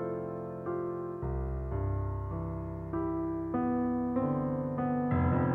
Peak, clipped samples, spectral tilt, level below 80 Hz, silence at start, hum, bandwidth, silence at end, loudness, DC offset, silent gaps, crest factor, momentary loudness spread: -16 dBFS; under 0.1%; -12 dB/octave; -44 dBFS; 0 s; none; 3.6 kHz; 0 s; -33 LUFS; under 0.1%; none; 16 dB; 7 LU